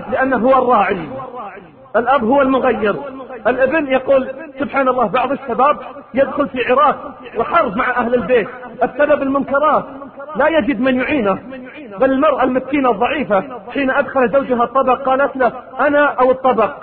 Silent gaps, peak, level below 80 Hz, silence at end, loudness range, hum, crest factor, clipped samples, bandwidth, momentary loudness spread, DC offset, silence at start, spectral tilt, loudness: none; -2 dBFS; -48 dBFS; 0 s; 1 LU; none; 14 dB; under 0.1%; 4.5 kHz; 12 LU; under 0.1%; 0 s; -10.5 dB/octave; -15 LUFS